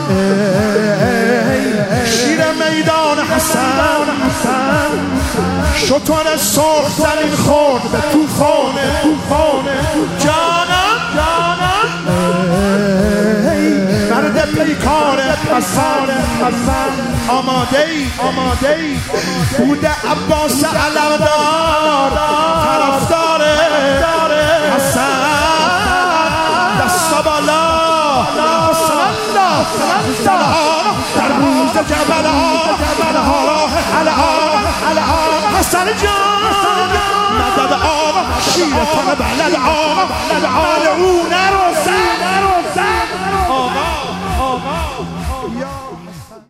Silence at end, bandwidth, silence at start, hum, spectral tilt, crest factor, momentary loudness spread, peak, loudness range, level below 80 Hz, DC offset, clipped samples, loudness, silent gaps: 0.1 s; 16 kHz; 0 s; none; -4 dB/octave; 14 dB; 4 LU; 0 dBFS; 2 LU; -32 dBFS; under 0.1%; under 0.1%; -13 LUFS; none